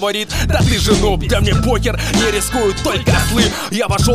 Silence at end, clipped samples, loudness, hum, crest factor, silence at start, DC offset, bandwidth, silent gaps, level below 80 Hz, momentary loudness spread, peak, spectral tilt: 0 s; under 0.1%; -15 LUFS; none; 14 dB; 0 s; under 0.1%; 16 kHz; none; -22 dBFS; 4 LU; 0 dBFS; -4.5 dB/octave